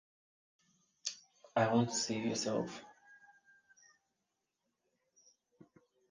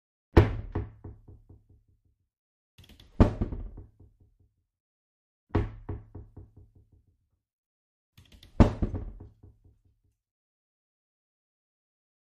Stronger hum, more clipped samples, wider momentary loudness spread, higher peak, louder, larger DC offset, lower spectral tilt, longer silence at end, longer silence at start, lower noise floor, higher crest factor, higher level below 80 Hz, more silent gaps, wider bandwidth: neither; neither; second, 20 LU vs 25 LU; second, -18 dBFS vs -4 dBFS; second, -36 LUFS vs -28 LUFS; neither; second, -4 dB/octave vs -9 dB/octave; second, 2.95 s vs 3.1 s; first, 1.05 s vs 0.35 s; first, -87 dBFS vs -72 dBFS; second, 22 dB vs 28 dB; second, -78 dBFS vs -38 dBFS; second, none vs 2.38-2.78 s, 4.80-5.47 s, 7.53-8.13 s; first, 10 kHz vs 8 kHz